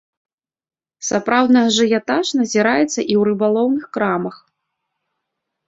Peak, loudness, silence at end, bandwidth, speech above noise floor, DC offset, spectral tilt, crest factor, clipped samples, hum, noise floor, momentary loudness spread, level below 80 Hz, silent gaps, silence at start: -2 dBFS; -17 LUFS; 1.35 s; 7.8 kHz; 61 dB; under 0.1%; -4 dB/octave; 16 dB; under 0.1%; none; -78 dBFS; 8 LU; -62 dBFS; none; 1 s